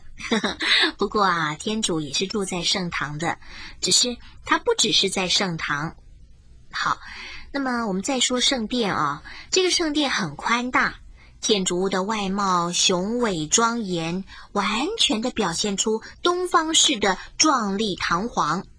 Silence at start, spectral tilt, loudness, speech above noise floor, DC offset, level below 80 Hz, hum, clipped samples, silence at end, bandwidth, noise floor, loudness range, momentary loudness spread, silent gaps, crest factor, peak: 0 s; -2.5 dB/octave; -22 LUFS; 24 dB; under 0.1%; -48 dBFS; none; under 0.1%; 0.15 s; 10.5 kHz; -47 dBFS; 3 LU; 9 LU; none; 18 dB; -4 dBFS